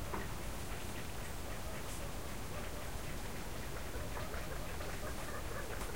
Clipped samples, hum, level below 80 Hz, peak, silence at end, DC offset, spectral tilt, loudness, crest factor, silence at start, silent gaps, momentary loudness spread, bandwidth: under 0.1%; none; -48 dBFS; -28 dBFS; 0 s; 0.6%; -4 dB/octave; -44 LUFS; 16 dB; 0 s; none; 2 LU; 16 kHz